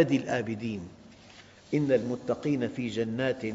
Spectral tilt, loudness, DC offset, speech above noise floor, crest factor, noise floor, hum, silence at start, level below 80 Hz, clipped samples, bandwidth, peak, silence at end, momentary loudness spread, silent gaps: -6 dB/octave; -30 LUFS; under 0.1%; 24 dB; 18 dB; -53 dBFS; none; 0 s; -64 dBFS; under 0.1%; 7.8 kHz; -10 dBFS; 0 s; 9 LU; none